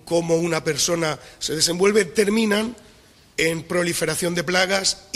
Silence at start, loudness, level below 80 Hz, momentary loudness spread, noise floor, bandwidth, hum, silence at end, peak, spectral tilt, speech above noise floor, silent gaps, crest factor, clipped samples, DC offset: 0.05 s; -21 LUFS; -52 dBFS; 7 LU; -51 dBFS; 16 kHz; none; 0.15 s; -2 dBFS; -3 dB/octave; 30 dB; none; 20 dB; under 0.1%; under 0.1%